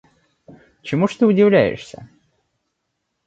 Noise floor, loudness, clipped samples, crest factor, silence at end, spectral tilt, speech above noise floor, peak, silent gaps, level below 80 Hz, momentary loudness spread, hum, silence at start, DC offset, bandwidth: -75 dBFS; -16 LUFS; under 0.1%; 18 dB; 1.2 s; -7.5 dB/octave; 58 dB; -2 dBFS; none; -56 dBFS; 22 LU; none; 0.85 s; under 0.1%; 8 kHz